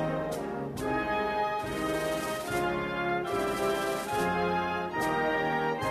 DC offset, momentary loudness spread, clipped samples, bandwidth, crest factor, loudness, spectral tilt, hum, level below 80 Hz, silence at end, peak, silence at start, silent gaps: under 0.1%; 4 LU; under 0.1%; 15 kHz; 14 dB; -30 LUFS; -5 dB/octave; none; -54 dBFS; 0 s; -16 dBFS; 0 s; none